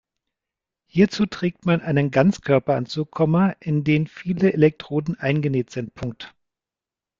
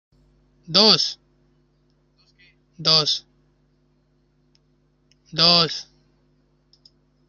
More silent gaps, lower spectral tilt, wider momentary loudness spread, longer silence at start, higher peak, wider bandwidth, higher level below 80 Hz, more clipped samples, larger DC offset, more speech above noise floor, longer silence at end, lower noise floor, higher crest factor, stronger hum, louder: neither; first, -7.5 dB/octave vs -3 dB/octave; second, 12 LU vs 15 LU; first, 0.95 s vs 0.7 s; second, -4 dBFS vs 0 dBFS; second, 7.6 kHz vs 12 kHz; first, -56 dBFS vs -62 dBFS; neither; neither; first, 69 dB vs 45 dB; second, 0.9 s vs 1.45 s; first, -90 dBFS vs -63 dBFS; second, 18 dB vs 24 dB; neither; second, -21 LUFS vs -17 LUFS